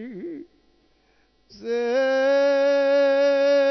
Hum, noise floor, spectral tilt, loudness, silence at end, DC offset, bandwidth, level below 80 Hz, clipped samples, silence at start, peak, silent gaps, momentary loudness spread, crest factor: none; -62 dBFS; -4 dB/octave; -20 LUFS; 0 s; under 0.1%; 6.2 kHz; -68 dBFS; under 0.1%; 0 s; -12 dBFS; none; 18 LU; 10 dB